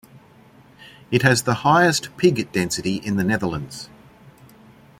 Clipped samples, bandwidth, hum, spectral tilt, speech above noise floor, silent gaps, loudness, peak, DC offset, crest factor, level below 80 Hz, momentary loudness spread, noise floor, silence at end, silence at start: under 0.1%; 16.5 kHz; none; -4.5 dB/octave; 30 dB; none; -20 LUFS; -2 dBFS; under 0.1%; 20 dB; -54 dBFS; 14 LU; -50 dBFS; 1.15 s; 0.8 s